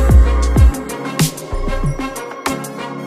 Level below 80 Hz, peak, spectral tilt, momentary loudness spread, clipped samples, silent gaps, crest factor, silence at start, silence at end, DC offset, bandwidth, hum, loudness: -16 dBFS; 0 dBFS; -5.5 dB/octave; 12 LU; under 0.1%; none; 14 dB; 0 s; 0 s; under 0.1%; 15.5 kHz; none; -17 LUFS